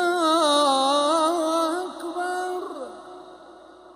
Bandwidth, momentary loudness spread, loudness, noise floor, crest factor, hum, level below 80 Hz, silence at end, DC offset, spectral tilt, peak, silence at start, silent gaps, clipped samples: 16 kHz; 19 LU; -22 LUFS; -47 dBFS; 16 dB; none; -70 dBFS; 0.05 s; under 0.1%; -1 dB/octave; -8 dBFS; 0 s; none; under 0.1%